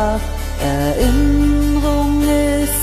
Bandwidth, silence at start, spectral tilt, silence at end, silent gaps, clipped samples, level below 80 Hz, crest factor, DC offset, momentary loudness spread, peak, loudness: 14 kHz; 0 s; -5.5 dB/octave; 0 s; none; under 0.1%; -20 dBFS; 12 dB; under 0.1%; 7 LU; -2 dBFS; -16 LUFS